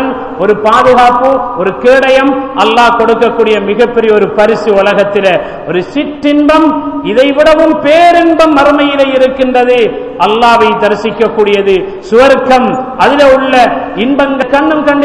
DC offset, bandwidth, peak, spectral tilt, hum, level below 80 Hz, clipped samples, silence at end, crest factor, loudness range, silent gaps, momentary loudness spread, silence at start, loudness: under 0.1%; 12 kHz; 0 dBFS; -5 dB/octave; none; -38 dBFS; 7%; 0 s; 8 dB; 2 LU; none; 7 LU; 0 s; -7 LUFS